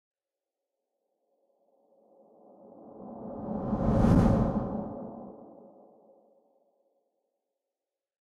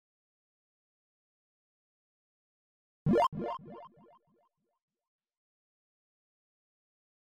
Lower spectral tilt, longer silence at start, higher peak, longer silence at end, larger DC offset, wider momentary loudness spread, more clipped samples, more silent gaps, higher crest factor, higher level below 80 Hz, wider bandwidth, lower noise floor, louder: first, -9.5 dB/octave vs -6.5 dB/octave; second, 2.75 s vs 3.05 s; first, -10 dBFS vs -16 dBFS; second, 2.75 s vs 3.5 s; neither; first, 25 LU vs 22 LU; neither; neither; about the same, 22 dB vs 24 dB; first, -42 dBFS vs -66 dBFS; first, 10.5 kHz vs 7.4 kHz; first, under -90 dBFS vs -76 dBFS; first, -28 LUFS vs -32 LUFS